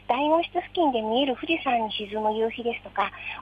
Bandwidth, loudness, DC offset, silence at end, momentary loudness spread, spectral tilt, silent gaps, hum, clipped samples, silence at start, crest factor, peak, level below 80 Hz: 7.4 kHz; -26 LUFS; under 0.1%; 0 s; 6 LU; -6.5 dB/octave; none; 50 Hz at -55 dBFS; under 0.1%; 0.1 s; 16 dB; -10 dBFS; -56 dBFS